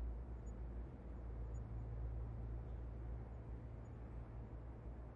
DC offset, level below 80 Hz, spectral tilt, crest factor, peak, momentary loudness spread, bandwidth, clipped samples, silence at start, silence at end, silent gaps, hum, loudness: under 0.1%; -50 dBFS; -10 dB/octave; 12 dB; -36 dBFS; 5 LU; 7.2 kHz; under 0.1%; 0 s; 0 s; none; none; -51 LUFS